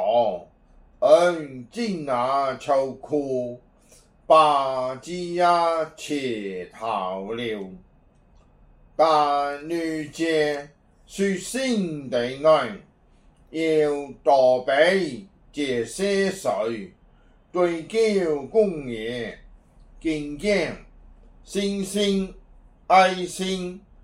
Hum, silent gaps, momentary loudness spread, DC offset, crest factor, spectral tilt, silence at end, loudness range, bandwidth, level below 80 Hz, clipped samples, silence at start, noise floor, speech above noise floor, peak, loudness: none; none; 14 LU; under 0.1%; 20 dB; -4.5 dB/octave; 0.25 s; 5 LU; 15.5 kHz; -54 dBFS; under 0.1%; 0 s; -56 dBFS; 34 dB; -4 dBFS; -23 LUFS